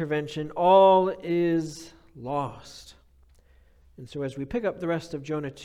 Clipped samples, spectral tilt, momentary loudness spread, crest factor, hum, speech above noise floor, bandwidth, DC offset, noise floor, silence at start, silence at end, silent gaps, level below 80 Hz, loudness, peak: under 0.1%; -6.5 dB/octave; 24 LU; 18 dB; none; 33 dB; 11.5 kHz; under 0.1%; -58 dBFS; 0 s; 0 s; none; -56 dBFS; -25 LUFS; -8 dBFS